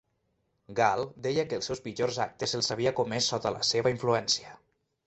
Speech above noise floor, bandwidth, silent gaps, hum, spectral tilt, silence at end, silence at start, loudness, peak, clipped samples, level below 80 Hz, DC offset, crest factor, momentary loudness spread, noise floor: 47 dB; 8.4 kHz; none; none; -3.5 dB/octave; 0.5 s; 0.7 s; -29 LUFS; -8 dBFS; under 0.1%; -64 dBFS; under 0.1%; 22 dB; 6 LU; -76 dBFS